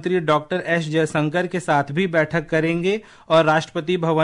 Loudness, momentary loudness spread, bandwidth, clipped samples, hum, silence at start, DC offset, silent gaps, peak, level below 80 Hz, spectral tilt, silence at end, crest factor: -20 LUFS; 5 LU; 11 kHz; under 0.1%; none; 0 s; under 0.1%; none; -6 dBFS; -56 dBFS; -6 dB/octave; 0 s; 14 dB